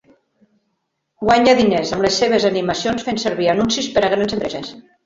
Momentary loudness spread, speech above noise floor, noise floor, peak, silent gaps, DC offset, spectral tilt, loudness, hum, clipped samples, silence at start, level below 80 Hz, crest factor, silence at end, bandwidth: 10 LU; 56 dB; -72 dBFS; -2 dBFS; none; under 0.1%; -4 dB/octave; -17 LUFS; none; under 0.1%; 1.2 s; -48 dBFS; 16 dB; 0.25 s; 7.8 kHz